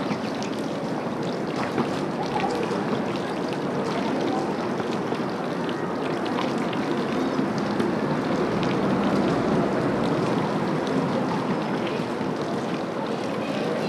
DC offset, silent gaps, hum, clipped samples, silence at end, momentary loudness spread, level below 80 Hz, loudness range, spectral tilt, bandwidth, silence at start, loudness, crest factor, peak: under 0.1%; none; none; under 0.1%; 0 s; 5 LU; -56 dBFS; 3 LU; -6.5 dB/octave; 13.5 kHz; 0 s; -26 LUFS; 16 dB; -10 dBFS